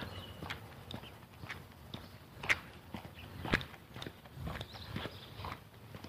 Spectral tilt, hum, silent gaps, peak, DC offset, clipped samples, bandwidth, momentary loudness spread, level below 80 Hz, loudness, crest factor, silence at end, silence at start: -4.5 dB/octave; none; none; -14 dBFS; under 0.1%; under 0.1%; 15.5 kHz; 15 LU; -56 dBFS; -42 LUFS; 30 dB; 0 s; 0 s